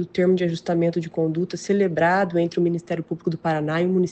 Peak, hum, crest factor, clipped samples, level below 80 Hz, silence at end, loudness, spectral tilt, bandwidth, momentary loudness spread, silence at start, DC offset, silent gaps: -8 dBFS; none; 14 dB; under 0.1%; -62 dBFS; 0 s; -22 LUFS; -7 dB/octave; 8.4 kHz; 7 LU; 0 s; under 0.1%; none